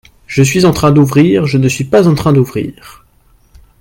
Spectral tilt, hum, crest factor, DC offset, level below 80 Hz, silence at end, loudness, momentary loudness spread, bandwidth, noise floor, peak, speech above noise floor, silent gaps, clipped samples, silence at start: -6.5 dB/octave; none; 12 dB; under 0.1%; -38 dBFS; 0.9 s; -10 LUFS; 9 LU; 17 kHz; -49 dBFS; 0 dBFS; 39 dB; none; under 0.1%; 0.3 s